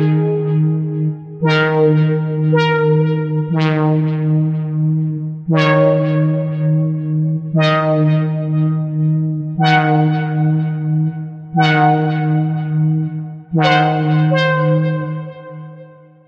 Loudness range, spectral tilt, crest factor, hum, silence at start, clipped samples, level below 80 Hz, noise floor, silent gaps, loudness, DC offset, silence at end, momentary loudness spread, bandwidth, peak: 1 LU; -8.5 dB/octave; 16 dB; none; 0 s; under 0.1%; -56 dBFS; -40 dBFS; none; -16 LUFS; under 0.1%; 0.35 s; 8 LU; 6.2 kHz; 0 dBFS